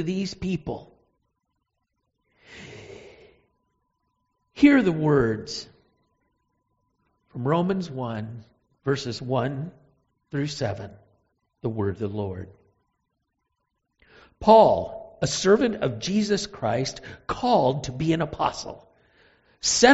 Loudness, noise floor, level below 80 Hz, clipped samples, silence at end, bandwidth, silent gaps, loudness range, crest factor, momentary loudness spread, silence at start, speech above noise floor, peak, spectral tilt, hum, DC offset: -24 LUFS; -78 dBFS; -54 dBFS; under 0.1%; 0 s; 8 kHz; none; 12 LU; 24 dB; 21 LU; 0 s; 55 dB; -2 dBFS; -4.5 dB/octave; none; under 0.1%